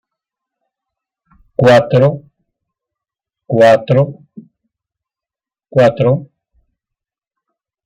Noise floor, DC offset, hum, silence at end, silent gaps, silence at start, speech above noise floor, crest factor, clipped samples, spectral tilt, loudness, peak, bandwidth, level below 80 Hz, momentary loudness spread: -89 dBFS; under 0.1%; none; 1.6 s; none; 1.6 s; 79 dB; 16 dB; under 0.1%; -7.5 dB/octave; -12 LUFS; 0 dBFS; 11 kHz; -54 dBFS; 11 LU